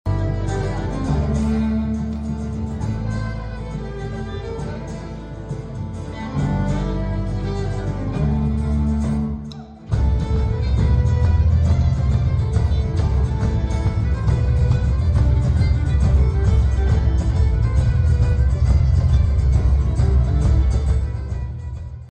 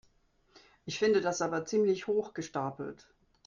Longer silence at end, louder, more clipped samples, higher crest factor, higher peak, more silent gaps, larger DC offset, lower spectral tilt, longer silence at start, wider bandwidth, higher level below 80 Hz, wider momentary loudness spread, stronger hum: second, 0.1 s vs 0.55 s; first, -20 LUFS vs -31 LUFS; neither; second, 10 dB vs 18 dB; first, -8 dBFS vs -16 dBFS; neither; neither; first, -8.5 dB/octave vs -4.5 dB/octave; second, 0.05 s vs 0.85 s; first, 8.8 kHz vs 7.4 kHz; first, -22 dBFS vs -70 dBFS; about the same, 12 LU vs 14 LU; neither